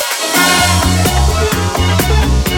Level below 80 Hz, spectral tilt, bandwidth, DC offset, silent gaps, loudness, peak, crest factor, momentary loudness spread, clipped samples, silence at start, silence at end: -18 dBFS; -3.5 dB/octave; 18 kHz; under 0.1%; none; -12 LUFS; 0 dBFS; 12 dB; 5 LU; under 0.1%; 0 s; 0 s